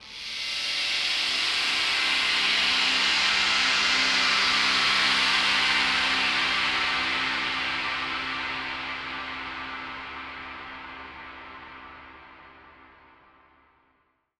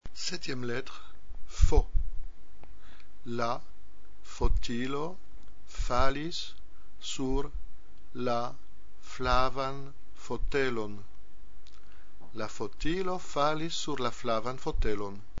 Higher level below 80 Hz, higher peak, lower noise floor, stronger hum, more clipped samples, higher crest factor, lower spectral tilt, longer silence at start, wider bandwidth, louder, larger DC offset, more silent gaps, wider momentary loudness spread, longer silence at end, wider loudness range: second, -56 dBFS vs -36 dBFS; about the same, -8 dBFS vs -6 dBFS; first, -70 dBFS vs -55 dBFS; neither; neither; second, 18 dB vs 24 dB; second, 0 dB/octave vs -5 dB/octave; about the same, 0 s vs 0 s; first, 14.5 kHz vs 7.6 kHz; first, -23 LUFS vs -33 LUFS; second, under 0.1% vs 3%; neither; about the same, 18 LU vs 19 LU; first, 1.7 s vs 0 s; first, 18 LU vs 4 LU